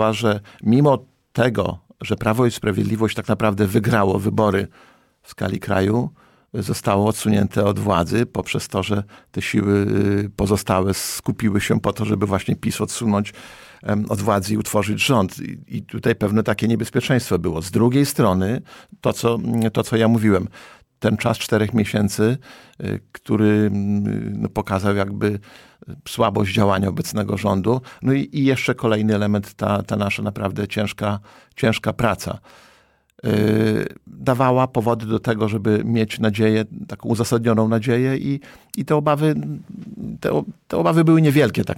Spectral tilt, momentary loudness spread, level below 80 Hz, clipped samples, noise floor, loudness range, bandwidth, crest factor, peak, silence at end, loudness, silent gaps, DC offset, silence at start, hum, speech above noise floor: -6 dB/octave; 11 LU; -48 dBFS; under 0.1%; -56 dBFS; 2 LU; 17 kHz; 16 dB; -4 dBFS; 0 s; -20 LUFS; none; under 0.1%; 0 s; none; 37 dB